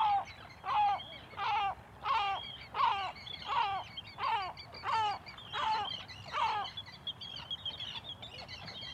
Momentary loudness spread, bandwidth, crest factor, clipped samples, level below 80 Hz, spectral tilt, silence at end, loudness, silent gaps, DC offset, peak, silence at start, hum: 11 LU; 13 kHz; 16 dB; under 0.1%; -64 dBFS; -3 dB/octave; 0 s; -36 LUFS; none; under 0.1%; -20 dBFS; 0 s; none